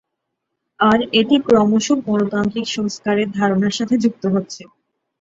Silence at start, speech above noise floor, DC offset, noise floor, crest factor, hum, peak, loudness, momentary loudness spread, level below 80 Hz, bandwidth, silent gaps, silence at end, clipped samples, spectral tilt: 0.8 s; 60 dB; under 0.1%; -77 dBFS; 16 dB; none; -2 dBFS; -17 LUFS; 8 LU; -54 dBFS; 7.8 kHz; none; 0.6 s; under 0.1%; -5 dB/octave